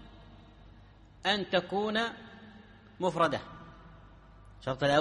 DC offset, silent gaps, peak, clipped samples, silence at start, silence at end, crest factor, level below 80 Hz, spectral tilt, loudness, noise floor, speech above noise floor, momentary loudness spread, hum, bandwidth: under 0.1%; none; -14 dBFS; under 0.1%; 0 s; 0 s; 20 dB; -58 dBFS; -5 dB/octave; -31 LUFS; -55 dBFS; 26 dB; 24 LU; none; 11 kHz